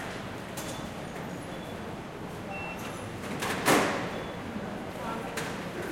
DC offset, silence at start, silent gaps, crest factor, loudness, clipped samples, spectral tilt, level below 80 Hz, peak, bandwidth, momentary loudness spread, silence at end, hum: under 0.1%; 0 s; none; 24 dB; -33 LUFS; under 0.1%; -4 dB/octave; -56 dBFS; -8 dBFS; 16.5 kHz; 13 LU; 0 s; none